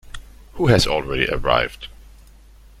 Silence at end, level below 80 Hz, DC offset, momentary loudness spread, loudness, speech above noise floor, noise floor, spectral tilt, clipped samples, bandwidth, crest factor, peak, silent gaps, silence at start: 0.95 s; -36 dBFS; under 0.1%; 23 LU; -19 LUFS; 27 dB; -46 dBFS; -5 dB/octave; under 0.1%; 15.5 kHz; 20 dB; -2 dBFS; none; 0.05 s